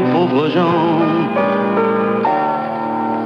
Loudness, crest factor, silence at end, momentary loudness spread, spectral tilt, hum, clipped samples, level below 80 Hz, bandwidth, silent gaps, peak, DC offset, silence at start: -16 LUFS; 12 dB; 0 s; 5 LU; -8.5 dB/octave; none; under 0.1%; -60 dBFS; 6.4 kHz; none; -4 dBFS; under 0.1%; 0 s